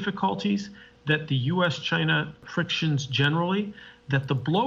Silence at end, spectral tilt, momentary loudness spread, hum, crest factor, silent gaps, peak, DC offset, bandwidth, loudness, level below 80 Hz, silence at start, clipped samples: 0 s; -6 dB/octave; 8 LU; none; 16 dB; none; -10 dBFS; under 0.1%; 7.6 kHz; -26 LUFS; -62 dBFS; 0 s; under 0.1%